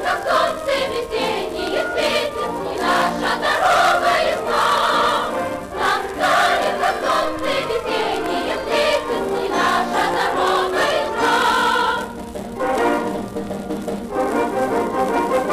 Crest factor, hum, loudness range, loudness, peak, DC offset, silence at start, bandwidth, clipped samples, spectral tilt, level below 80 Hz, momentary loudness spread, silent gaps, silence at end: 14 dB; none; 3 LU; -19 LUFS; -6 dBFS; under 0.1%; 0 s; 15.5 kHz; under 0.1%; -3.5 dB/octave; -46 dBFS; 9 LU; none; 0 s